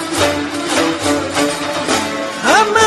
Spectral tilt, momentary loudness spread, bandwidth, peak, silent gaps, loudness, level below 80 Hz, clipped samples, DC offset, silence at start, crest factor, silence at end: -2.5 dB/octave; 6 LU; 13.5 kHz; 0 dBFS; none; -15 LUFS; -48 dBFS; under 0.1%; under 0.1%; 0 s; 14 dB; 0 s